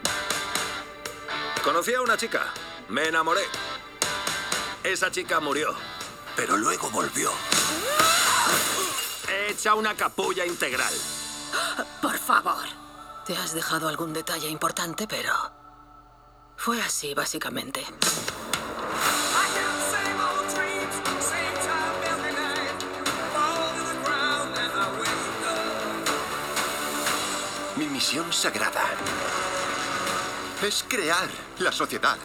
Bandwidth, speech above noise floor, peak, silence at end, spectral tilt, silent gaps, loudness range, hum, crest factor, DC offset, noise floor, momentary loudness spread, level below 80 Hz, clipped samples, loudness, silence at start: over 20 kHz; 26 dB; -4 dBFS; 0 s; -1.5 dB/octave; none; 6 LU; none; 24 dB; under 0.1%; -53 dBFS; 8 LU; -58 dBFS; under 0.1%; -26 LUFS; 0 s